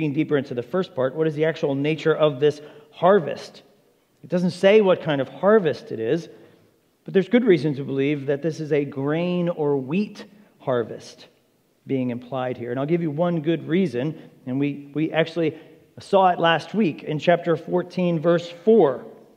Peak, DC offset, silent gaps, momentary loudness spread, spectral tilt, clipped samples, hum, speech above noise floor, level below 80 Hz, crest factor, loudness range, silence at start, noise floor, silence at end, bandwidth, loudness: -4 dBFS; under 0.1%; none; 10 LU; -7.5 dB/octave; under 0.1%; none; 41 dB; -76 dBFS; 18 dB; 6 LU; 0 s; -63 dBFS; 0.2 s; 10 kHz; -22 LUFS